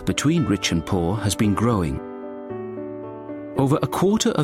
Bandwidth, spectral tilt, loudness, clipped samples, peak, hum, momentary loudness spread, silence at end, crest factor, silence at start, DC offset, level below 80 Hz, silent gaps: 16 kHz; -5.5 dB/octave; -22 LUFS; under 0.1%; -6 dBFS; none; 14 LU; 0 s; 16 dB; 0 s; under 0.1%; -42 dBFS; none